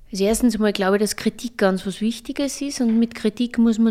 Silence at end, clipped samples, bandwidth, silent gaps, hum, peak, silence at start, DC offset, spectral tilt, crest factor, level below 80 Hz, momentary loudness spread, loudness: 0 s; under 0.1%; 15.5 kHz; none; none; -4 dBFS; 0.1 s; under 0.1%; -5 dB/octave; 16 dB; -46 dBFS; 7 LU; -21 LUFS